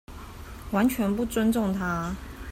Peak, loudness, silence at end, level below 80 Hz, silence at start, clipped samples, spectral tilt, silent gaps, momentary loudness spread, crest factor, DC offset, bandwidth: -12 dBFS; -26 LUFS; 0 s; -44 dBFS; 0.1 s; under 0.1%; -6 dB/octave; none; 18 LU; 16 dB; under 0.1%; 16 kHz